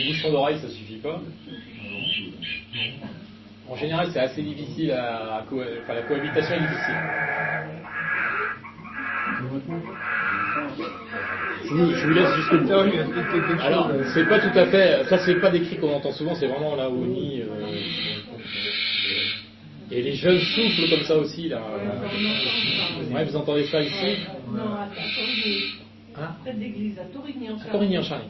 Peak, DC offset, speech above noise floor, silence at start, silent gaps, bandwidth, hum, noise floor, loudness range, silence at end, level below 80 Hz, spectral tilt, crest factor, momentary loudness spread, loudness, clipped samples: -4 dBFS; under 0.1%; 21 dB; 0 s; none; 6 kHz; none; -44 dBFS; 8 LU; 0 s; -58 dBFS; -6.5 dB/octave; 22 dB; 14 LU; -24 LUFS; under 0.1%